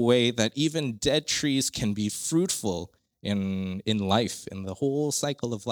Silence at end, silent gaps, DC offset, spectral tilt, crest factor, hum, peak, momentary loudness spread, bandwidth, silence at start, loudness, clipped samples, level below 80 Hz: 0 s; none; under 0.1%; -4 dB/octave; 20 dB; none; -8 dBFS; 8 LU; over 20 kHz; 0 s; -27 LUFS; under 0.1%; -56 dBFS